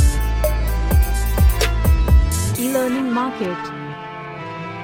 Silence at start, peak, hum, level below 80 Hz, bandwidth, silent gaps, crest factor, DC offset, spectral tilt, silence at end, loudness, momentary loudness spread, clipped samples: 0 s; -4 dBFS; none; -20 dBFS; 17 kHz; none; 14 dB; under 0.1%; -5.5 dB/octave; 0 s; -19 LUFS; 14 LU; under 0.1%